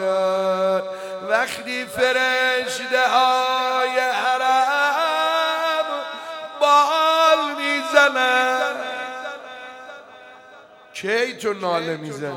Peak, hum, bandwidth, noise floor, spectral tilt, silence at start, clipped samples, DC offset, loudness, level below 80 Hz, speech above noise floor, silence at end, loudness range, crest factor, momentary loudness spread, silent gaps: -2 dBFS; none; 17 kHz; -46 dBFS; -2.5 dB/octave; 0 s; under 0.1%; under 0.1%; -19 LUFS; -70 dBFS; 25 dB; 0 s; 8 LU; 20 dB; 15 LU; none